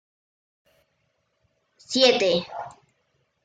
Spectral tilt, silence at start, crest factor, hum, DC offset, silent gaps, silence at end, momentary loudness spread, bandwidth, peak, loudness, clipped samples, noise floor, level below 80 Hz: -3 dB/octave; 1.9 s; 22 dB; none; under 0.1%; none; 0.75 s; 20 LU; 9.2 kHz; -6 dBFS; -21 LUFS; under 0.1%; -72 dBFS; -70 dBFS